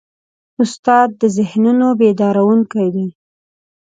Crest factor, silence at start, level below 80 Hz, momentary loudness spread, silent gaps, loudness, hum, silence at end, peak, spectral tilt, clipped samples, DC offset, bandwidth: 14 dB; 0.6 s; -64 dBFS; 7 LU; 0.79-0.83 s; -14 LUFS; none; 0.75 s; 0 dBFS; -7 dB/octave; under 0.1%; under 0.1%; 9.2 kHz